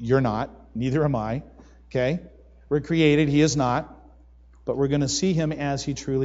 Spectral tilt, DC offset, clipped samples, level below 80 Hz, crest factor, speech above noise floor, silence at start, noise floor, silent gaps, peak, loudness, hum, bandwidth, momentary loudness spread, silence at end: -5.5 dB/octave; under 0.1%; under 0.1%; -46 dBFS; 18 dB; 28 dB; 0 s; -51 dBFS; none; -6 dBFS; -24 LUFS; none; 8 kHz; 12 LU; 0 s